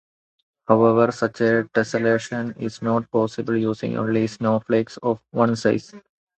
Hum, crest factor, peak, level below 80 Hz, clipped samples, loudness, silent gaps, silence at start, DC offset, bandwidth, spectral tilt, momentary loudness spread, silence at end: none; 20 dB; -2 dBFS; -60 dBFS; under 0.1%; -21 LUFS; none; 0.7 s; under 0.1%; 8.8 kHz; -7 dB/octave; 9 LU; 0.4 s